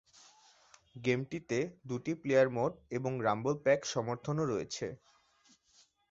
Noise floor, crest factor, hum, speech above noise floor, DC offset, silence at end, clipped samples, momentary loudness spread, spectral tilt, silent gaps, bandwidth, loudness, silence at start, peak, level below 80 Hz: -68 dBFS; 20 dB; none; 35 dB; under 0.1%; 1.15 s; under 0.1%; 11 LU; -5.5 dB/octave; none; 7.8 kHz; -34 LUFS; 0.95 s; -16 dBFS; -70 dBFS